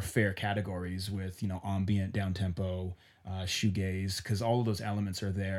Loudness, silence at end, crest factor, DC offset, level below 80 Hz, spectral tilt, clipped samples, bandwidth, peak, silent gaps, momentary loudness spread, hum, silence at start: -34 LUFS; 0 s; 20 dB; under 0.1%; -56 dBFS; -5.5 dB/octave; under 0.1%; 15.5 kHz; -14 dBFS; none; 7 LU; none; 0 s